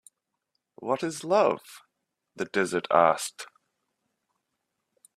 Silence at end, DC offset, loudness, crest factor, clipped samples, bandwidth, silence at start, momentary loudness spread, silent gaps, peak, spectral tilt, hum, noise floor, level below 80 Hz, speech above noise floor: 1.7 s; under 0.1%; -26 LUFS; 24 dB; under 0.1%; 14 kHz; 0.8 s; 17 LU; none; -4 dBFS; -4 dB/octave; none; -81 dBFS; -76 dBFS; 55 dB